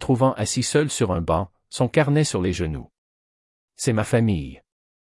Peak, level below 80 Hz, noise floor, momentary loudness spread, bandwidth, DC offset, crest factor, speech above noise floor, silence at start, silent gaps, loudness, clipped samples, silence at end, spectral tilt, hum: -6 dBFS; -46 dBFS; under -90 dBFS; 9 LU; 12 kHz; under 0.1%; 18 dB; over 69 dB; 0 s; 2.98-3.68 s; -22 LUFS; under 0.1%; 0.45 s; -5.5 dB/octave; none